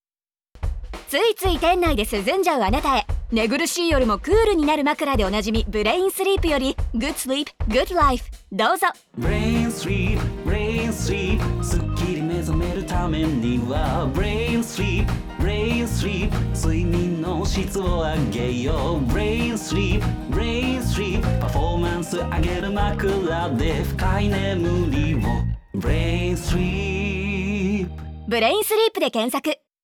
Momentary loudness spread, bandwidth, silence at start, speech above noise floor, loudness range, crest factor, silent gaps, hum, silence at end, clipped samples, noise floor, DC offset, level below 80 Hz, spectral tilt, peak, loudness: 6 LU; 19.5 kHz; 0.55 s; over 69 dB; 3 LU; 16 dB; none; none; 0.3 s; under 0.1%; under -90 dBFS; under 0.1%; -28 dBFS; -5.5 dB/octave; -6 dBFS; -22 LUFS